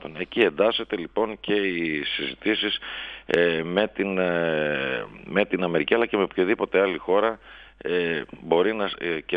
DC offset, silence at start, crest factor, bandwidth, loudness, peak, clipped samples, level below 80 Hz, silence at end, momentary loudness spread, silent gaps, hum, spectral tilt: under 0.1%; 0 s; 20 dB; 6.2 kHz; -24 LUFS; -4 dBFS; under 0.1%; -56 dBFS; 0 s; 7 LU; none; none; -7 dB/octave